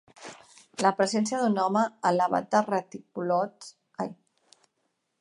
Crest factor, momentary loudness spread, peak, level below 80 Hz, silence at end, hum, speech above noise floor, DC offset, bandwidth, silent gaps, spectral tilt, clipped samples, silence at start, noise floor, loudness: 20 dB; 19 LU; -8 dBFS; -76 dBFS; 1.05 s; none; 51 dB; under 0.1%; 11.5 kHz; none; -5 dB/octave; under 0.1%; 0.2 s; -77 dBFS; -27 LUFS